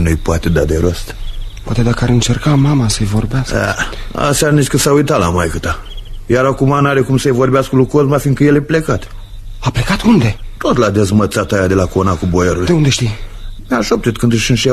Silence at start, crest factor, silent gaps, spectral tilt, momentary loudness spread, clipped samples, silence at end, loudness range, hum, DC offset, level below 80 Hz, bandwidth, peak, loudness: 0 s; 12 dB; none; -5.5 dB/octave; 9 LU; under 0.1%; 0 s; 2 LU; none; under 0.1%; -26 dBFS; 13 kHz; 0 dBFS; -13 LUFS